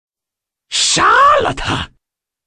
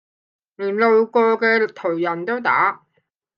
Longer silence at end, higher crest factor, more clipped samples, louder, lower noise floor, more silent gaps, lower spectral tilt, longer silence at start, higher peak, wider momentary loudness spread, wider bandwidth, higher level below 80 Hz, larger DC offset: about the same, 0.6 s vs 0.6 s; about the same, 14 dB vs 18 dB; neither; first, -12 LUFS vs -18 LUFS; first, -85 dBFS vs -69 dBFS; neither; second, -2 dB/octave vs -7 dB/octave; about the same, 0.7 s vs 0.6 s; about the same, -2 dBFS vs -2 dBFS; first, 12 LU vs 8 LU; first, 10.5 kHz vs 5.8 kHz; first, -38 dBFS vs -78 dBFS; neither